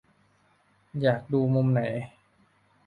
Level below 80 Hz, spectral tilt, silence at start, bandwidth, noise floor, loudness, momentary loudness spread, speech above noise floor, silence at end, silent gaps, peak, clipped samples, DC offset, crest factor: -64 dBFS; -9.5 dB/octave; 0.95 s; 4.8 kHz; -65 dBFS; -26 LUFS; 14 LU; 40 dB; 0.8 s; none; -10 dBFS; under 0.1%; under 0.1%; 18 dB